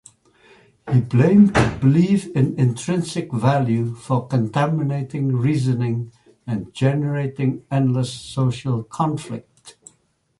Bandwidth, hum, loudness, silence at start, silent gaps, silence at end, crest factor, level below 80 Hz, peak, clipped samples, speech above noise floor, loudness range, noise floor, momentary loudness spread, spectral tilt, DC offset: 11.5 kHz; none; -20 LUFS; 0.85 s; none; 0.7 s; 16 dB; -46 dBFS; -4 dBFS; under 0.1%; 44 dB; 5 LU; -63 dBFS; 12 LU; -7.5 dB/octave; under 0.1%